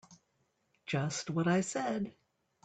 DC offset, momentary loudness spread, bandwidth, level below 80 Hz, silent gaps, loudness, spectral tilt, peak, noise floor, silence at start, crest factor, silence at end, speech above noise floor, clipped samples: under 0.1%; 10 LU; 9.2 kHz; -72 dBFS; none; -34 LUFS; -5 dB/octave; -20 dBFS; -77 dBFS; 0.1 s; 18 dB; 0.55 s; 44 dB; under 0.1%